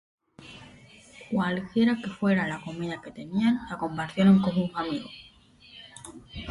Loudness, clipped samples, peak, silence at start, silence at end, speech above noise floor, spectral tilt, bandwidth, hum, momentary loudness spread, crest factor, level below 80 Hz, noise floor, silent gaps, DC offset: -27 LUFS; under 0.1%; -10 dBFS; 0.4 s; 0 s; 28 dB; -7 dB/octave; 11.5 kHz; none; 24 LU; 18 dB; -58 dBFS; -54 dBFS; none; under 0.1%